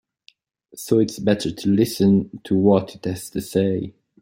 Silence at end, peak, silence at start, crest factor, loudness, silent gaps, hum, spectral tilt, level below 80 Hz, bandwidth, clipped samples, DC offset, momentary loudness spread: 0.3 s; -4 dBFS; 0.75 s; 18 dB; -21 LUFS; none; none; -6.5 dB/octave; -56 dBFS; 16.5 kHz; under 0.1%; under 0.1%; 12 LU